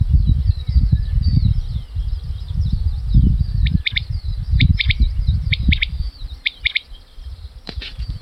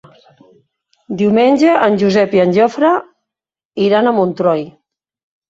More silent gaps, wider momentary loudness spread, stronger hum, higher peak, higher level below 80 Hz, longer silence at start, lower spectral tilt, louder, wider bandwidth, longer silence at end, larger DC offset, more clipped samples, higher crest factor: second, none vs 3.65-3.71 s; first, 13 LU vs 9 LU; neither; second, -4 dBFS vs 0 dBFS; first, -20 dBFS vs -58 dBFS; second, 0 s vs 1.1 s; about the same, -7 dB/octave vs -7 dB/octave; second, -20 LUFS vs -13 LUFS; second, 5.8 kHz vs 7.8 kHz; second, 0 s vs 0.8 s; neither; neither; about the same, 14 dB vs 14 dB